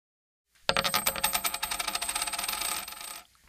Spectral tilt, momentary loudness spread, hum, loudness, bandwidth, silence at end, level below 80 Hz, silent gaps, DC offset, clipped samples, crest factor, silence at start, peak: 0 dB/octave; 9 LU; none; -29 LUFS; 15.5 kHz; 0.25 s; -56 dBFS; none; under 0.1%; under 0.1%; 28 dB; 0.7 s; -6 dBFS